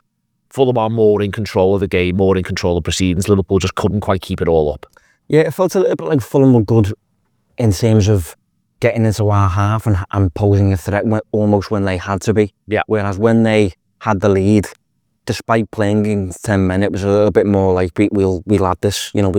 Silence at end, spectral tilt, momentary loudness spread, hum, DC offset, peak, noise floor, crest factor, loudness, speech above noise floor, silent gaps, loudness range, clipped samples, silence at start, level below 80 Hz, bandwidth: 0 s; -7 dB/octave; 6 LU; none; under 0.1%; 0 dBFS; -68 dBFS; 14 dB; -15 LUFS; 54 dB; none; 1 LU; under 0.1%; 0.55 s; -42 dBFS; 17 kHz